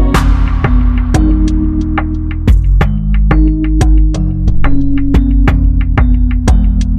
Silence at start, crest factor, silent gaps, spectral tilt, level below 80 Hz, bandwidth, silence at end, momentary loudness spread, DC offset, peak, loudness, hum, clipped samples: 0 s; 8 dB; none; -7.5 dB/octave; -10 dBFS; 9.2 kHz; 0 s; 3 LU; under 0.1%; 0 dBFS; -12 LUFS; none; under 0.1%